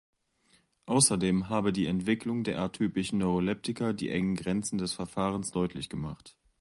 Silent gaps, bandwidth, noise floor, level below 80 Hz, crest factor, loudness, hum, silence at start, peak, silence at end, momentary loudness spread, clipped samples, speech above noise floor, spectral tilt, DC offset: none; 11.5 kHz; -68 dBFS; -56 dBFS; 20 dB; -30 LUFS; none; 0.85 s; -10 dBFS; 0.3 s; 9 LU; under 0.1%; 38 dB; -4.5 dB/octave; under 0.1%